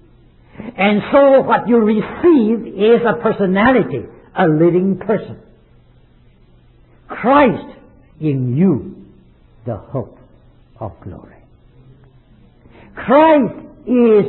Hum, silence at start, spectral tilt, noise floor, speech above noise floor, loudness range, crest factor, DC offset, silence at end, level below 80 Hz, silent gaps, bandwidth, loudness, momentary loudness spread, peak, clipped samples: none; 0.6 s; -12 dB/octave; -48 dBFS; 35 dB; 18 LU; 16 dB; under 0.1%; 0 s; -48 dBFS; none; 4.2 kHz; -14 LUFS; 20 LU; 0 dBFS; under 0.1%